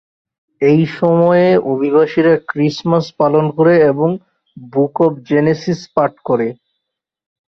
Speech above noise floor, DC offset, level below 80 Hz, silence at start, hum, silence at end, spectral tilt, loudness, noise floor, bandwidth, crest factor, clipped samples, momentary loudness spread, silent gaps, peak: 64 dB; under 0.1%; -56 dBFS; 0.6 s; none; 0.95 s; -8 dB/octave; -14 LUFS; -78 dBFS; 6.4 kHz; 14 dB; under 0.1%; 7 LU; none; -2 dBFS